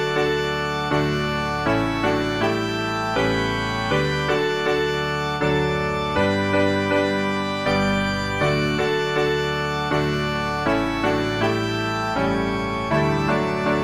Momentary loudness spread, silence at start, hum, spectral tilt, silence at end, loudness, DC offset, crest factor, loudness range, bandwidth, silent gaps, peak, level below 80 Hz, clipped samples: 3 LU; 0 s; none; -5.5 dB/octave; 0 s; -22 LUFS; 0.4%; 14 dB; 1 LU; 15.5 kHz; none; -8 dBFS; -40 dBFS; under 0.1%